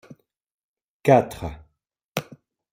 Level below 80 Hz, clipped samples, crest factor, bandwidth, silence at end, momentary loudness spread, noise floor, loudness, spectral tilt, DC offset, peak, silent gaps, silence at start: -50 dBFS; under 0.1%; 24 dB; 16 kHz; 0.5 s; 17 LU; -73 dBFS; -22 LUFS; -6.5 dB/octave; under 0.1%; -2 dBFS; 2.08-2.12 s; 1.05 s